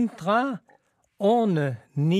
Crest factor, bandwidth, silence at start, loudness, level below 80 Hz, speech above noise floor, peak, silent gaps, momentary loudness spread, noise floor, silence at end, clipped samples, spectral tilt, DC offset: 14 dB; 12 kHz; 0 s; -24 LUFS; -76 dBFS; 40 dB; -10 dBFS; none; 8 LU; -63 dBFS; 0 s; under 0.1%; -8 dB/octave; under 0.1%